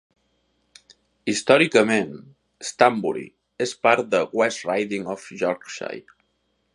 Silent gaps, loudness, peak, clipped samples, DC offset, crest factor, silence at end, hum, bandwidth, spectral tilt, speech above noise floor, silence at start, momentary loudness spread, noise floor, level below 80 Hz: none; -22 LUFS; 0 dBFS; under 0.1%; under 0.1%; 24 dB; 0.75 s; none; 11.5 kHz; -4 dB/octave; 49 dB; 1.25 s; 16 LU; -70 dBFS; -70 dBFS